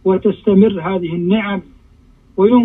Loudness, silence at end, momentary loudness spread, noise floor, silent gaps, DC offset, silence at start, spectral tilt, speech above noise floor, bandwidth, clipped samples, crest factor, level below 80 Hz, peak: -15 LUFS; 0 s; 11 LU; -47 dBFS; none; under 0.1%; 0.05 s; -10.5 dB/octave; 34 dB; 3.9 kHz; under 0.1%; 14 dB; -46 dBFS; 0 dBFS